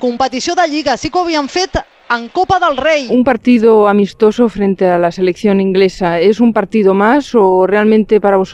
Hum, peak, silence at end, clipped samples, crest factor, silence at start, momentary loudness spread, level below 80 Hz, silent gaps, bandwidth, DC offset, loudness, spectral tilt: none; 0 dBFS; 0 s; under 0.1%; 12 dB; 0 s; 6 LU; -40 dBFS; none; 9.4 kHz; under 0.1%; -12 LUFS; -5.5 dB/octave